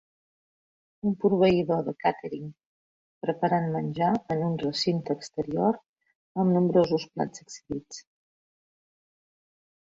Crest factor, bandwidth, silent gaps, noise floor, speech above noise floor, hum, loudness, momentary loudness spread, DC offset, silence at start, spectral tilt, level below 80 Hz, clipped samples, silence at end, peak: 18 dB; 7.8 kHz; 2.66-3.21 s, 5.88-5.94 s, 6.15-6.35 s; under -90 dBFS; over 64 dB; none; -27 LUFS; 15 LU; under 0.1%; 1.05 s; -6.5 dB/octave; -62 dBFS; under 0.1%; 1.8 s; -10 dBFS